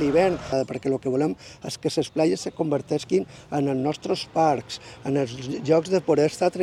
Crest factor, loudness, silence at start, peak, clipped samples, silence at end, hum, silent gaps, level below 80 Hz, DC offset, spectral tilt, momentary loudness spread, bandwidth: 18 dB; -24 LUFS; 0 s; -6 dBFS; under 0.1%; 0 s; none; none; -56 dBFS; under 0.1%; -6 dB/octave; 8 LU; 13.5 kHz